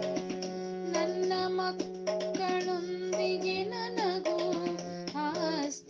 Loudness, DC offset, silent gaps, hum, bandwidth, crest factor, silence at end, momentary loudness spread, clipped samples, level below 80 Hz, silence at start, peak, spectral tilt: -33 LUFS; under 0.1%; none; none; 7.6 kHz; 14 dB; 0 s; 6 LU; under 0.1%; -74 dBFS; 0 s; -18 dBFS; -4.5 dB/octave